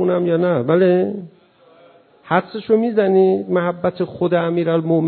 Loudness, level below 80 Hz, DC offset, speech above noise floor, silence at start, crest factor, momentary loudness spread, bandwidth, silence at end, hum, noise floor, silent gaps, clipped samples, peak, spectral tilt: -17 LUFS; -60 dBFS; under 0.1%; 33 dB; 0 s; 16 dB; 7 LU; 4.5 kHz; 0 s; none; -50 dBFS; none; under 0.1%; -2 dBFS; -12.5 dB/octave